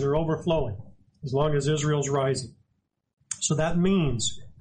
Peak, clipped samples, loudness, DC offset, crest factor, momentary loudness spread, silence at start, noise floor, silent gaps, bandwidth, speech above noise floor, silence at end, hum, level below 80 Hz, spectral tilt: -12 dBFS; under 0.1%; -26 LUFS; under 0.1%; 14 dB; 12 LU; 0 s; -75 dBFS; 3.13-3.17 s; 10 kHz; 50 dB; 0.1 s; none; -44 dBFS; -5 dB/octave